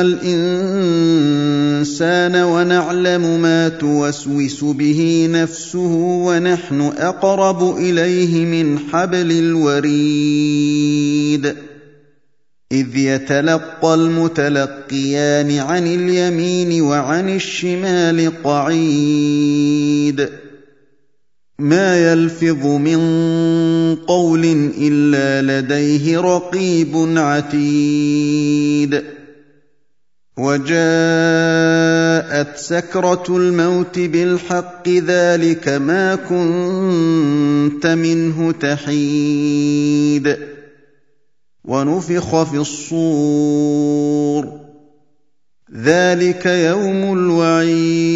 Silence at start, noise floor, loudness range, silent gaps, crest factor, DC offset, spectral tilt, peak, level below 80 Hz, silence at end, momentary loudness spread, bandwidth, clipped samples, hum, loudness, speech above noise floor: 0 s; -74 dBFS; 3 LU; none; 16 dB; 0.2%; -6 dB/octave; 0 dBFS; -60 dBFS; 0 s; 5 LU; 7.8 kHz; under 0.1%; none; -15 LUFS; 59 dB